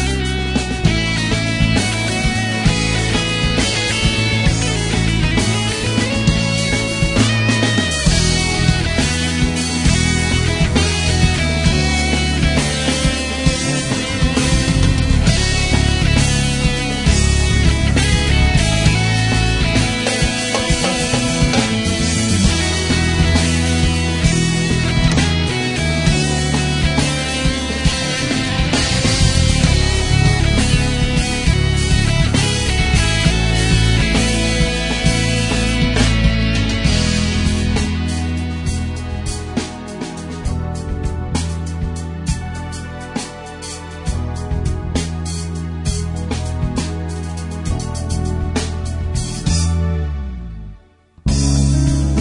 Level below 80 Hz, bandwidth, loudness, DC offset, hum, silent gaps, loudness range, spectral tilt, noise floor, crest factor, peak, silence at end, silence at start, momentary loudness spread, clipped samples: -22 dBFS; 11 kHz; -16 LUFS; under 0.1%; none; none; 8 LU; -4.5 dB/octave; -47 dBFS; 16 dB; 0 dBFS; 0 s; 0 s; 9 LU; under 0.1%